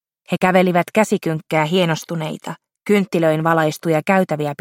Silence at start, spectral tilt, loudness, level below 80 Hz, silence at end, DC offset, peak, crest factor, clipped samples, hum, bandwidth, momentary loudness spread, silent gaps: 0.3 s; -6 dB/octave; -18 LUFS; -64 dBFS; 0.05 s; under 0.1%; -2 dBFS; 16 dB; under 0.1%; none; 16.5 kHz; 11 LU; none